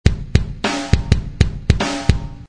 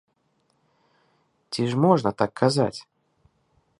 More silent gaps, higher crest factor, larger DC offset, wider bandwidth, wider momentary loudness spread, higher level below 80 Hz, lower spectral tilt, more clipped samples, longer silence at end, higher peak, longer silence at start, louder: neither; about the same, 18 dB vs 22 dB; neither; about the same, 10.5 kHz vs 11.5 kHz; second, 3 LU vs 11 LU; first, -22 dBFS vs -62 dBFS; about the same, -5.5 dB/octave vs -6.5 dB/octave; first, 0.2% vs under 0.1%; second, 0.05 s vs 1 s; first, 0 dBFS vs -4 dBFS; second, 0.05 s vs 1.5 s; first, -19 LUFS vs -23 LUFS